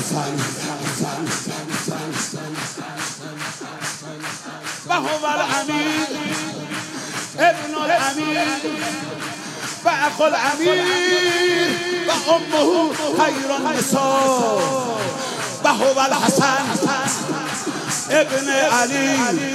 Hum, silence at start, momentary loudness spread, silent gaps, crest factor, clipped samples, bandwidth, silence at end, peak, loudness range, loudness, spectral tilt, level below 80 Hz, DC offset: none; 0 s; 11 LU; none; 18 dB; under 0.1%; 16 kHz; 0 s; -2 dBFS; 8 LU; -20 LUFS; -3 dB/octave; -68 dBFS; under 0.1%